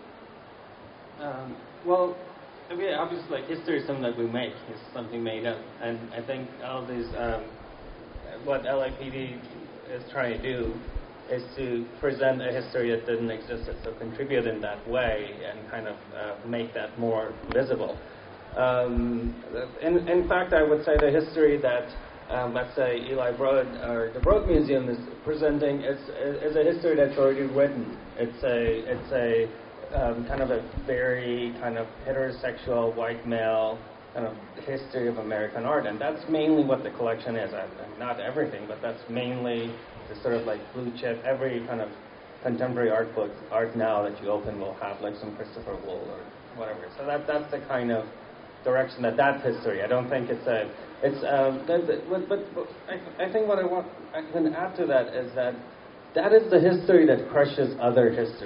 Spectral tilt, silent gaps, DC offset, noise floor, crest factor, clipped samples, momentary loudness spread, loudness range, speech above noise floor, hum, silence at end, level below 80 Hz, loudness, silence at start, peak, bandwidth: -5 dB/octave; none; under 0.1%; -47 dBFS; 22 dB; under 0.1%; 15 LU; 8 LU; 20 dB; none; 0 s; -44 dBFS; -28 LUFS; 0 s; -6 dBFS; 5.4 kHz